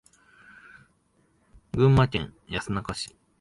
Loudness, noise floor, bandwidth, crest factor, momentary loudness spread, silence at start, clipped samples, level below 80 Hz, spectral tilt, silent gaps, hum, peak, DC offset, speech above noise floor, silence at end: -26 LUFS; -66 dBFS; 11.5 kHz; 20 dB; 15 LU; 1.75 s; under 0.1%; -46 dBFS; -6.5 dB/octave; none; none; -8 dBFS; under 0.1%; 42 dB; 0.35 s